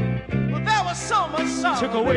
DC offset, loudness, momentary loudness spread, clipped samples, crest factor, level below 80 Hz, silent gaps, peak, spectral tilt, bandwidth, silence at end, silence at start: under 0.1%; -23 LUFS; 3 LU; under 0.1%; 14 dB; -44 dBFS; none; -8 dBFS; -5 dB/octave; 11.5 kHz; 0 s; 0 s